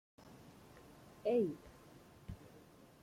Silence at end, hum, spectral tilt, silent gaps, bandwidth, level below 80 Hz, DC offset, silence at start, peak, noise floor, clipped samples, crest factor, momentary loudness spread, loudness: 0.45 s; none; -7.5 dB/octave; none; 16.5 kHz; -66 dBFS; under 0.1%; 0.25 s; -24 dBFS; -62 dBFS; under 0.1%; 20 dB; 25 LU; -38 LUFS